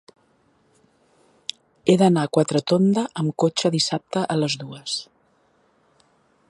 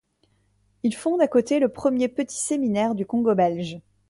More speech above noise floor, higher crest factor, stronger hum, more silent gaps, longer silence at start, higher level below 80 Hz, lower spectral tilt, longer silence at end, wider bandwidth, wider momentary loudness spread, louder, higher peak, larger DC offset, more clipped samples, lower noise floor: about the same, 42 dB vs 44 dB; about the same, 20 dB vs 16 dB; neither; neither; first, 1.85 s vs 0.85 s; second, -68 dBFS vs -62 dBFS; about the same, -5.5 dB/octave vs -5.5 dB/octave; first, 1.45 s vs 0.3 s; about the same, 11.5 kHz vs 11.5 kHz; first, 13 LU vs 7 LU; about the same, -21 LUFS vs -23 LUFS; first, -2 dBFS vs -8 dBFS; neither; neither; second, -62 dBFS vs -66 dBFS